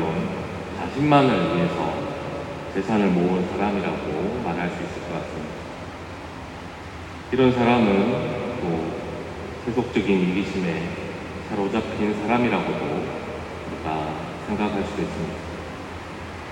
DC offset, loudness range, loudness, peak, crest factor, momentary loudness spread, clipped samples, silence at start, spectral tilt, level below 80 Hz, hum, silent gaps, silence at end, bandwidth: under 0.1%; 6 LU; -24 LUFS; -4 dBFS; 20 dB; 16 LU; under 0.1%; 0 s; -7 dB/octave; -48 dBFS; none; none; 0 s; 16 kHz